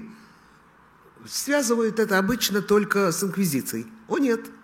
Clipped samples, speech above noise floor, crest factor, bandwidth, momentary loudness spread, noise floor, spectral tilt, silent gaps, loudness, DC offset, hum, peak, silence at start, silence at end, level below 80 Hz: under 0.1%; 31 dB; 18 dB; 16.5 kHz; 8 LU; -54 dBFS; -4 dB/octave; none; -23 LUFS; under 0.1%; none; -6 dBFS; 0 s; 0.1 s; -58 dBFS